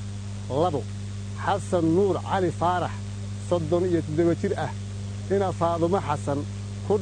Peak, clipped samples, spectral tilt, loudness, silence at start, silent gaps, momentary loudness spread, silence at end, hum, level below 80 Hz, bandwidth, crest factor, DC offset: -10 dBFS; under 0.1%; -7 dB/octave; -26 LUFS; 0 s; none; 11 LU; 0 s; 50 Hz at -35 dBFS; -48 dBFS; 9.6 kHz; 16 dB; under 0.1%